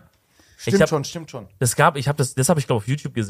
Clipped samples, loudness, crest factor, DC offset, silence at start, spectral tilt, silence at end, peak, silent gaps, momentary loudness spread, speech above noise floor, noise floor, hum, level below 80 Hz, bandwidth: under 0.1%; -20 LUFS; 20 dB; under 0.1%; 0.6 s; -5 dB/octave; 0 s; -2 dBFS; none; 13 LU; 36 dB; -57 dBFS; none; -52 dBFS; 15.5 kHz